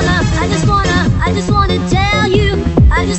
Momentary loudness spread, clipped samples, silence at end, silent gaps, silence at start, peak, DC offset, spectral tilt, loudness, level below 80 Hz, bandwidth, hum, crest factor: 2 LU; under 0.1%; 0 s; none; 0 s; 0 dBFS; under 0.1%; -5.5 dB/octave; -12 LUFS; -18 dBFS; 8.4 kHz; none; 12 dB